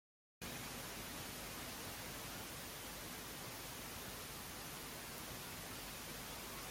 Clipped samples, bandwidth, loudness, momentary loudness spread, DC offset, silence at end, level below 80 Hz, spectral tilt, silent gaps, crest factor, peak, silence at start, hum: under 0.1%; 16.5 kHz; -47 LUFS; 1 LU; under 0.1%; 0 s; -64 dBFS; -2.5 dB/octave; none; 18 dB; -30 dBFS; 0.4 s; none